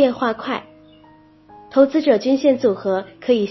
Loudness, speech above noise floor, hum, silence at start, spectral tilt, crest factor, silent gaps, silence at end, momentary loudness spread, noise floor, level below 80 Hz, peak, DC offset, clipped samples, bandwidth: -18 LUFS; 31 dB; none; 0 s; -6.5 dB/octave; 18 dB; none; 0 s; 10 LU; -49 dBFS; -60 dBFS; -2 dBFS; under 0.1%; under 0.1%; 6 kHz